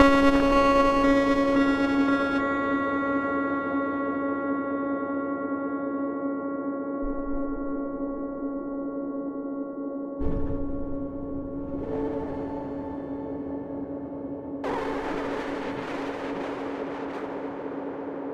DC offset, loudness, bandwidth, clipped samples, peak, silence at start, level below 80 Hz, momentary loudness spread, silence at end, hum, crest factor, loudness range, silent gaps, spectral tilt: under 0.1%; -28 LUFS; 8.8 kHz; under 0.1%; -2 dBFS; 0 s; -42 dBFS; 13 LU; 0 s; none; 24 dB; 9 LU; none; -6.5 dB/octave